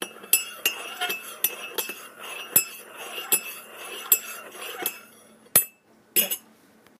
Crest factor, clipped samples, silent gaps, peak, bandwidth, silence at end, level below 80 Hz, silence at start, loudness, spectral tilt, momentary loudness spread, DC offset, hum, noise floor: 28 dB; under 0.1%; none; -2 dBFS; 15.5 kHz; 0.6 s; -70 dBFS; 0 s; -24 LUFS; 0.5 dB/octave; 16 LU; under 0.1%; none; -56 dBFS